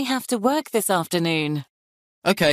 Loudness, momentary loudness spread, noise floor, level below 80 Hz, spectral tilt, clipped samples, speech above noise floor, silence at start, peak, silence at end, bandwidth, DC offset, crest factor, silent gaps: -23 LUFS; 5 LU; under -90 dBFS; -62 dBFS; -4 dB/octave; under 0.1%; over 68 dB; 0 s; -6 dBFS; 0 s; 15.5 kHz; under 0.1%; 18 dB; 1.70-2.22 s